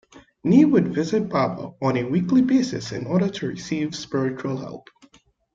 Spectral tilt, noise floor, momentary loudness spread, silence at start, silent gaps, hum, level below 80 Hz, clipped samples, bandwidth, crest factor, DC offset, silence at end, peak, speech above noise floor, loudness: -7 dB/octave; -57 dBFS; 12 LU; 0.15 s; none; none; -58 dBFS; under 0.1%; 7.6 kHz; 18 dB; under 0.1%; 0.75 s; -4 dBFS; 35 dB; -22 LUFS